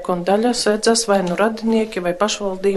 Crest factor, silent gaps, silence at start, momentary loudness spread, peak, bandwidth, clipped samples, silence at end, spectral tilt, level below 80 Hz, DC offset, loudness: 16 dB; none; 0 s; 4 LU; -2 dBFS; 12.5 kHz; under 0.1%; 0 s; -4 dB/octave; -52 dBFS; under 0.1%; -18 LUFS